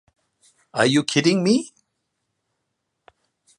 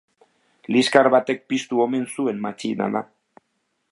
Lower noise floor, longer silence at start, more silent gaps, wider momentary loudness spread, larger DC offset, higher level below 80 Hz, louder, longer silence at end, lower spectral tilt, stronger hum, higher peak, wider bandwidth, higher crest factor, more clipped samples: first, -77 dBFS vs -73 dBFS; about the same, 0.75 s vs 0.7 s; neither; about the same, 11 LU vs 12 LU; neither; about the same, -70 dBFS vs -74 dBFS; about the same, -20 LUFS vs -21 LUFS; first, 1.9 s vs 0.9 s; about the same, -4.5 dB/octave vs -4.5 dB/octave; neither; about the same, -2 dBFS vs 0 dBFS; about the same, 11.5 kHz vs 11.5 kHz; about the same, 22 dB vs 22 dB; neither